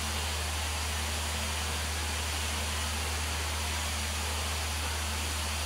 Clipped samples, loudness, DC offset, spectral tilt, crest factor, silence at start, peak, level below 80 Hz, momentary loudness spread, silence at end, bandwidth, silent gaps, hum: under 0.1%; -32 LUFS; under 0.1%; -2.5 dB/octave; 12 dB; 0 s; -20 dBFS; -40 dBFS; 0 LU; 0 s; 16 kHz; none; none